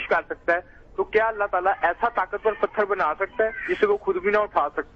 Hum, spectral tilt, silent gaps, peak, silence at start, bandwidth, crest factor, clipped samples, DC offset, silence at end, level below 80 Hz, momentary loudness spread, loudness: none; -6 dB/octave; none; -8 dBFS; 0 s; 6.4 kHz; 16 dB; under 0.1%; under 0.1%; 0.1 s; -52 dBFS; 3 LU; -24 LUFS